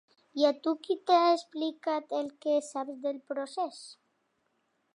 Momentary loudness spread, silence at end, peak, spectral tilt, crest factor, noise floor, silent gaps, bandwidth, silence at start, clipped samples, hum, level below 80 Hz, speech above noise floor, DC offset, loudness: 13 LU; 1 s; -12 dBFS; -2.5 dB/octave; 20 dB; -76 dBFS; none; 11.5 kHz; 0.35 s; under 0.1%; none; -90 dBFS; 46 dB; under 0.1%; -30 LUFS